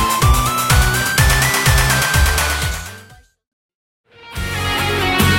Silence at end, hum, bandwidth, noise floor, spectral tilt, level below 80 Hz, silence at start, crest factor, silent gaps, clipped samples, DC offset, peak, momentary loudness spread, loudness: 0 s; none; 17 kHz; -44 dBFS; -3 dB/octave; -22 dBFS; 0 s; 16 dB; 3.47-3.69 s, 3.75-4.04 s; under 0.1%; under 0.1%; 0 dBFS; 11 LU; -15 LUFS